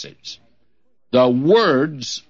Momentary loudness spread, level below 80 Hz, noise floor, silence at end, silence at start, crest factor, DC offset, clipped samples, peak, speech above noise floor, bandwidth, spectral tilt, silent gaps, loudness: 20 LU; -66 dBFS; -70 dBFS; 0.1 s; 0 s; 16 dB; 0.2%; under 0.1%; -2 dBFS; 52 dB; 7.8 kHz; -5 dB/octave; none; -16 LUFS